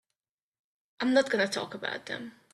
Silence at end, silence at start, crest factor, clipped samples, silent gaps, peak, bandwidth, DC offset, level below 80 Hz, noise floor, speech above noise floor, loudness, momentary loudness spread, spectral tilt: 0.25 s; 1 s; 20 dB; under 0.1%; none; -12 dBFS; 12.5 kHz; under 0.1%; -76 dBFS; -88 dBFS; 59 dB; -30 LUFS; 13 LU; -3.5 dB/octave